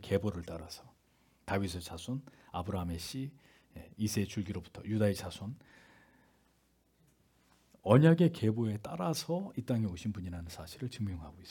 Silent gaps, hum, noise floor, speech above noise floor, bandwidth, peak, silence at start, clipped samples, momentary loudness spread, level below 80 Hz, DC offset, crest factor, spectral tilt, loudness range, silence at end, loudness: none; none; -72 dBFS; 38 dB; 18 kHz; -10 dBFS; 0 s; under 0.1%; 18 LU; -64 dBFS; under 0.1%; 26 dB; -6.5 dB/octave; 9 LU; 0 s; -34 LUFS